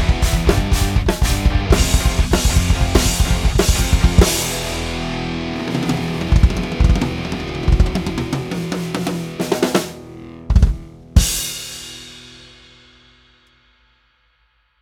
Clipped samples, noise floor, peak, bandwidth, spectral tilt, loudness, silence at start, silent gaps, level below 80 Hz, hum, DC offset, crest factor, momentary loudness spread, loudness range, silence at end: under 0.1%; -61 dBFS; 0 dBFS; 17.5 kHz; -4.5 dB/octave; -18 LUFS; 0 s; none; -20 dBFS; none; under 0.1%; 16 dB; 11 LU; 6 LU; 2.45 s